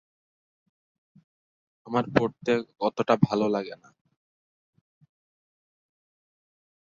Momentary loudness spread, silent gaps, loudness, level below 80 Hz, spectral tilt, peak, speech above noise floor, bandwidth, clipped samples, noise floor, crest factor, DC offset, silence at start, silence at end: 8 LU; none; -26 LUFS; -66 dBFS; -7 dB/octave; -2 dBFS; over 64 dB; 7.4 kHz; under 0.1%; under -90 dBFS; 28 dB; under 0.1%; 1.85 s; 3.1 s